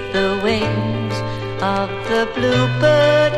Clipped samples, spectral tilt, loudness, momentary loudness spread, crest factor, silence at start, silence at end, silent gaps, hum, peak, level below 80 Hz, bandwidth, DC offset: under 0.1%; -6 dB/octave; -18 LUFS; 9 LU; 14 dB; 0 s; 0 s; none; none; -4 dBFS; -42 dBFS; 12.5 kHz; under 0.1%